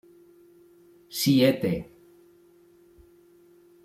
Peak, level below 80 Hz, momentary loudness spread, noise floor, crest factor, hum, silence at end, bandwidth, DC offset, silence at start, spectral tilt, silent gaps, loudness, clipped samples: -8 dBFS; -60 dBFS; 16 LU; -57 dBFS; 20 dB; none; 2 s; 16 kHz; under 0.1%; 1.1 s; -5.5 dB/octave; none; -24 LUFS; under 0.1%